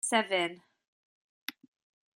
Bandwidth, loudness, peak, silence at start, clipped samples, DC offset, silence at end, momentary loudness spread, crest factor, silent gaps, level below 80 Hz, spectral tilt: 16 kHz; -30 LUFS; -12 dBFS; 0.05 s; under 0.1%; under 0.1%; 0.65 s; 17 LU; 22 dB; 0.88-1.48 s; -90 dBFS; -1.5 dB/octave